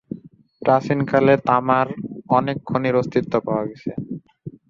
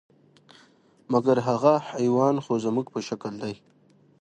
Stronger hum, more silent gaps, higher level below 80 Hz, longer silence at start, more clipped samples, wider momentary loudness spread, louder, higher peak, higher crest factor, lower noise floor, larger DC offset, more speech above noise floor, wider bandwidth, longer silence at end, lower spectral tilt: neither; neither; first, -56 dBFS vs -68 dBFS; second, 0.1 s vs 1.1 s; neither; first, 18 LU vs 13 LU; first, -20 LUFS vs -25 LUFS; first, -2 dBFS vs -6 dBFS; about the same, 18 dB vs 20 dB; second, -42 dBFS vs -58 dBFS; neither; second, 23 dB vs 34 dB; second, 7.4 kHz vs 9.4 kHz; second, 0.2 s vs 0.65 s; first, -8.5 dB/octave vs -7 dB/octave